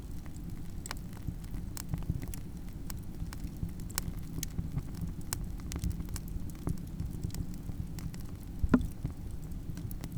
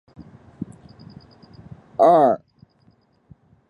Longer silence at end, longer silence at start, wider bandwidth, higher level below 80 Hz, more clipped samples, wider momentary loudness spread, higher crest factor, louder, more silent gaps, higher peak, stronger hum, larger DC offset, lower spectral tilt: second, 0 s vs 1.3 s; second, 0 s vs 0.6 s; first, over 20 kHz vs 10 kHz; first, -42 dBFS vs -60 dBFS; neither; second, 6 LU vs 23 LU; first, 26 dB vs 20 dB; second, -39 LUFS vs -17 LUFS; neither; second, -10 dBFS vs -2 dBFS; neither; neither; second, -5.5 dB/octave vs -8 dB/octave